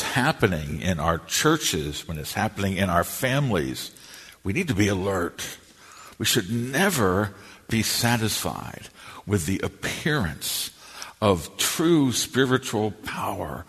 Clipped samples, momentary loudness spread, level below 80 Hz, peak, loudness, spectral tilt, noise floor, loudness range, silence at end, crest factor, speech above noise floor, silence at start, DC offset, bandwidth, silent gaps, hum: under 0.1%; 14 LU; -48 dBFS; -4 dBFS; -24 LUFS; -4 dB/octave; -47 dBFS; 3 LU; 0.05 s; 20 dB; 23 dB; 0 s; under 0.1%; 13.5 kHz; none; none